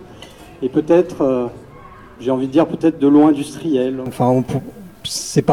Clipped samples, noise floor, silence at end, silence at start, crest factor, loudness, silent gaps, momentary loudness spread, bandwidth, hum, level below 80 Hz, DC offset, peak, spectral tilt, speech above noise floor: under 0.1%; -39 dBFS; 0 s; 0 s; 16 dB; -17 LUFS; none; 13 LU; 14.5 kHz; none; -50 dBFS; under 0.1%; 0 dBFS; -6 dB/octave; 23 dB